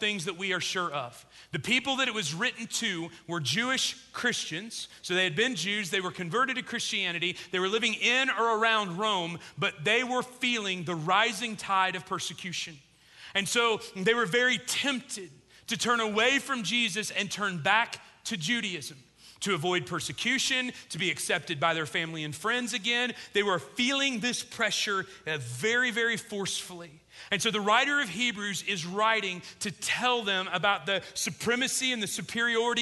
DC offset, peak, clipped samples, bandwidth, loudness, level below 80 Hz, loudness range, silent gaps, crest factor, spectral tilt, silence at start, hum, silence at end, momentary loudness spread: under 0.1%; -10 dBFS; under 0.1%; 12.5 kHz; -28 LUFS; -70 dBFS; 3 LU; none; 20 dB; -2.5 dB/octave; 0 s; none; 0 s; 9 LU